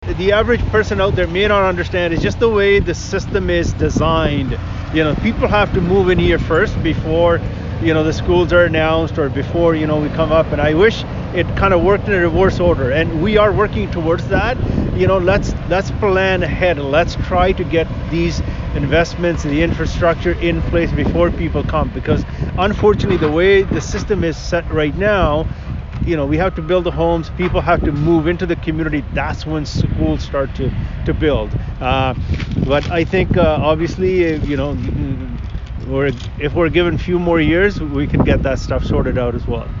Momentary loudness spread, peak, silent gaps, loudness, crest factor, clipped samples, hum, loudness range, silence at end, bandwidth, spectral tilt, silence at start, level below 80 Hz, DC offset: 7 LU; -2 dBFS; none; -16 LUFS; 14 dB; under 0.1%; none; 3 LU; 0 s; 7.6 kHz; -7 dB/octave; 0 s; -26 dBFS; under 0.1%